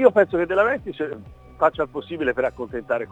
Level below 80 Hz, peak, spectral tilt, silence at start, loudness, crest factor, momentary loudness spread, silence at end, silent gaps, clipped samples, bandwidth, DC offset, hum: -50 dBFS; 0 dBFS; -7 dB/octave; 0 s; -23 LUFS; 20 dB; 11 LU; 0 s; none; under 0.1%; 8 kHz; under 0.1%; none